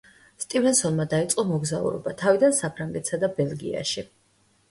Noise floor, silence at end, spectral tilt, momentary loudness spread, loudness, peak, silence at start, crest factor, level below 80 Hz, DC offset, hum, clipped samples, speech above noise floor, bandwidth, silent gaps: -64 dBFS; 0.65 s; -4.5 dB/octave; 10 LU; -24 LUFS; -6 dBFS; 0.4 s; 18 dB; -60 dBFS; under 0.1%; none; under 0.1%; 40 dB; 12 kHz; none